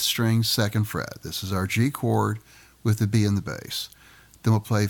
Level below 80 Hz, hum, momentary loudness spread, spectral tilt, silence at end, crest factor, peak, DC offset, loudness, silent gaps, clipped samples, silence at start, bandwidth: -54 dBFS; none; 10 LU; -5 dB/octave; 0 s; 14 dB; -10 dBFS; under 0.1%; -25 LUFS; none; under 0.1%; 0 s; 19 kHz